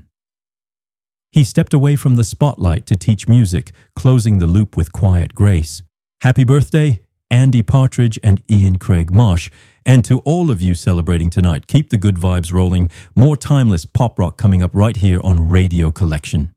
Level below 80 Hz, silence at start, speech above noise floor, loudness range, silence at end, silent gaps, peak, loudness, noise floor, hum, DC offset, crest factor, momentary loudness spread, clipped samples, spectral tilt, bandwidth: -30 dBFS; 1.35 s; over 77 dB; 1 LU; 0.05 s; none; 0 dBFS; -14 LUFS; under -90 dBFS; none; under 0.1%; 12 dB; 6 LU; under 0.1%; -7.5 dB/octave; 13.5 kHz